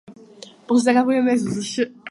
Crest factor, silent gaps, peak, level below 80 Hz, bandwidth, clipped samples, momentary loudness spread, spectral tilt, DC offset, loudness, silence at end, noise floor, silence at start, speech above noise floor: 16 dB; none; -4 dBFS; -62 dBFS; 11.5 kHz; under 0.1%; 8 LU; -5 dB/octave; under 0.1%; -20 LUFS; 0 s; -44 dBFS; 0.1 s; 25 dB